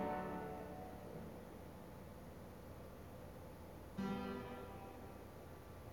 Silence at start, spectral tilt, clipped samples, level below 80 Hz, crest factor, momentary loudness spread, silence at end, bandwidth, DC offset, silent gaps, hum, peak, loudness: 0 s; -6.5 dB/octave; under 0.1%; -64 dBFS; 18 dB; 11 LU; 0 s; 19 kHz; under 0.1%; none; none; -32 dBFS; -51 LUFS